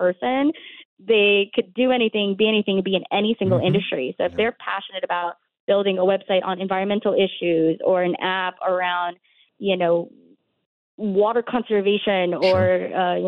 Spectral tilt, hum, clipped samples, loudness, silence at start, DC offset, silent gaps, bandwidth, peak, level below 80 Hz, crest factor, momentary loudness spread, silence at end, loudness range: -8 dB/octave; none; under 0.1%; -21 LUFS; 0 s; under 0.1%; 0.85-0.97 s, 5.60-5.67 s, 10.66-10.98 s; 5.8 kHz; -8 dBFS; -62 dBFS; 14 dB; 7 LU; 0 s; 4 LU